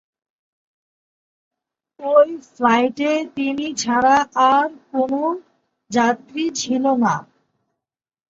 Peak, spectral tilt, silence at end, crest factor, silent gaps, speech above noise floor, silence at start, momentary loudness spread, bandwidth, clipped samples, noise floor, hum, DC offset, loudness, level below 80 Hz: -2 dBFS; -4 dB/octave; 1.1 s; 18 dB; none; 65 dB; 2 s; 8 LU; 7.8 kHz; under 0.1%; -84 dBFS; none; under 0.1%; -19 LUFS; -64 dBFS